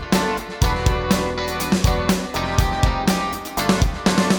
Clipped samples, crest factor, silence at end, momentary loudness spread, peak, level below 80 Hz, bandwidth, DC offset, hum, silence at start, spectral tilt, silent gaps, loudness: under 0.1%; 16 dB; 0 s; 4 LU; -2 dBFS; -26 dBFS; over 20 kHz; under 0.1%; none; 0 s; -5 dB/octave; none; -20 LUFS